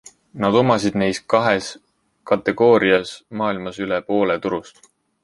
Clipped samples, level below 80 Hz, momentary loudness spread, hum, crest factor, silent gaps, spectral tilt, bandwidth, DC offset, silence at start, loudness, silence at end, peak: under 0.1%; -54 dBFS; 11 LU; none; 18 dB; none; -5.5 dB/octave; 11.5 kHz; under 0.1%; 0.35 s; -19 LUFS; 0.55 s; -2 dBFS